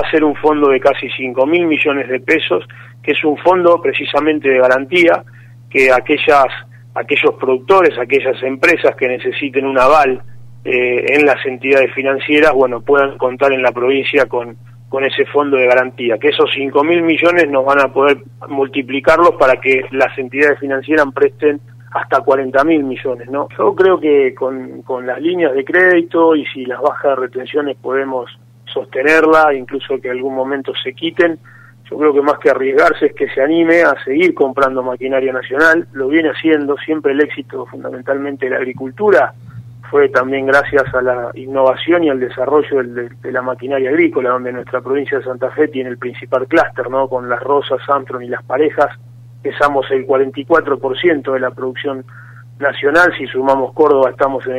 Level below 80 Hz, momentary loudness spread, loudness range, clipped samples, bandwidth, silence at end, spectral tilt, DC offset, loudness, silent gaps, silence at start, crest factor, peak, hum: -52 dBFS; 11 LU; 4 LU; under 0.1%; 12 kHz; 0 s; -6 dB/octave; under 0.1%; -14 LUFS; none; 0 s; 14 dB; 0 dBFS; none